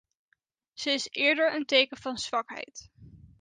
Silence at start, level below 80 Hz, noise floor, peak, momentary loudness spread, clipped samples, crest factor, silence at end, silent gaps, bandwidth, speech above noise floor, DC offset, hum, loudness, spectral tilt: 0.75 s; -66 dBFS; -75 dBFS; -8 dBFS; 16 LU; under 0.1%; 22 dB; 0.25 s; none; 9.8 kHz; 46 dB; under 0.1%; none; -27 LUFS; -2 dB/octave